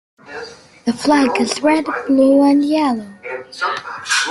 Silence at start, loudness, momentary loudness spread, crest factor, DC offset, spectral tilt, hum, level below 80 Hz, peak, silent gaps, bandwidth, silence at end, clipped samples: 0.25 s; -16 LUFS; 19 LU; 14 dB; under 0.1%; -3 dB/octave; none; -60 dBFS; -2 dBFS; none; 12 kHz; 0 s; under 0.1%